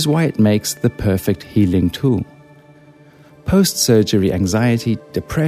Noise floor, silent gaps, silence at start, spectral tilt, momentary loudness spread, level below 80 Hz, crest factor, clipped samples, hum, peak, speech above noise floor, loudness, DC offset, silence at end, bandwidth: -45 dBFS; none; 0 s; -5.5 dB/octave; 8 LU; -40 dBFS; 16 dB; under 0.1%; none; -2 dBFS; 29 dB; -16 LUFS; under 0.1%; 0 s; 15.5 kHz